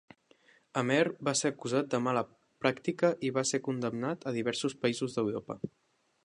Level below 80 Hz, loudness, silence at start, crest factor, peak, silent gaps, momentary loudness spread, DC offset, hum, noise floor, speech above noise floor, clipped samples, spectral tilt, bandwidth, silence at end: -74 dBFS; -32 LUFS; 0.75 s; 22 dB; -10 dBFS; none; 8 LU; under 0.1%; none; -65 dBFS; 33 dB; under 0.1%; -4.5 dB/octave; 11 kHz; 0.55 s